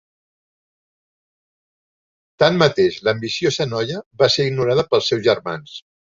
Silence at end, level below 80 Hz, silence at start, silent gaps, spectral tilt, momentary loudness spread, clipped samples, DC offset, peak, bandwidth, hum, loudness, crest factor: 0.35 s; -56 dBFS; 2.4 s; 4.06-4.11 s; -5 dB/octave; 12 LU; under 0.1%; under 0.1%; -2 dBFS; 7.6 kHz; none; -18 LUFS; 20 dB